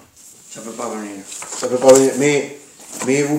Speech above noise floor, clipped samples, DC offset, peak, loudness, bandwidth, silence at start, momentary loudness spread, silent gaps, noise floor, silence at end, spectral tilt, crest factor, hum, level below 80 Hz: 28 dB; under 0.1%; under 0.1%; 0 dBFS; -16 LUFS; 16 kHz; 0.5 s; 22 LU; none; -44 dBFS; 0 s; -4 dB/octave; 18 dB; none; -60 dBFS